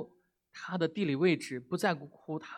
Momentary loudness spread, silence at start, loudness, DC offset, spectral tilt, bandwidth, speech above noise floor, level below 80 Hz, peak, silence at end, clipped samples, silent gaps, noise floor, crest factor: 17 LU; 0 s; -33 LUFS; under 0.1%; -6 dB/octave; 14.5 kHz; 33 dB; -80 dBFS; -14 dBFS; 0 s; under 0.1%; none; -66 dBFS; 20 dB